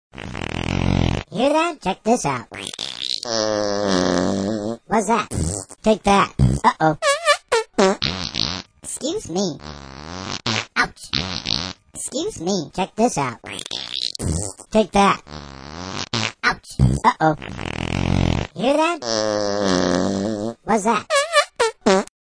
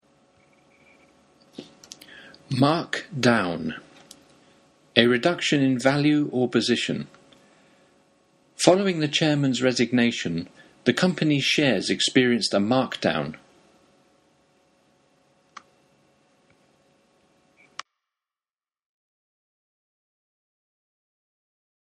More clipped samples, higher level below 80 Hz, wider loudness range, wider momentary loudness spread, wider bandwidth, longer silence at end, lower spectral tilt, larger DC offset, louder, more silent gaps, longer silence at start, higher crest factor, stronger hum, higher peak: neither; first, -38 dBFS vs -66 dBFS; about the same, 5 LU vs 6 LU; second, 11 LU vs 22 LU; second, 10.5 kHz vs 12 kHz; second, 0.15 s vs 8.5 s; about the same, -4.5 dB/octave vs -4.5 dB/octave; neither; about the same, -21 LUFS vs -22 LUFS; neither; second, 0.15 s vs 1.6 s; second, 20 dB vs 26 dB; neither; about the same, 0 dBFS vs 0 dBFS